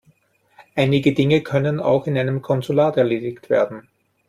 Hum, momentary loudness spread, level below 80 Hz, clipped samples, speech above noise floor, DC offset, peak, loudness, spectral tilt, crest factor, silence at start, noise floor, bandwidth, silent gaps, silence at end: none; 7 LU; -56 dBFS; under 0.1%; 41 dB; under 0.1%; -4 dBFS; -19 LUFS; -7.5 dB/octave; 16 dB; 0.75 s; -59 dBFS; 13.5 kHz; none; 0.5 s